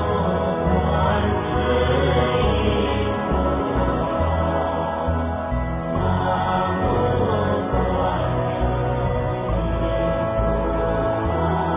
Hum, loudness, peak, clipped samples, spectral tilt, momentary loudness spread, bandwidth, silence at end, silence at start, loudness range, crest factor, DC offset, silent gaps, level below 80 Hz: none; -21 LUFS; -6 dBFS; under 0.1%; -11 dB/octave; 4 LU; 3.8 kHz; 0 s; 0 s; 2 LU; 14 dB; under 0.1%; none; -28 dBFS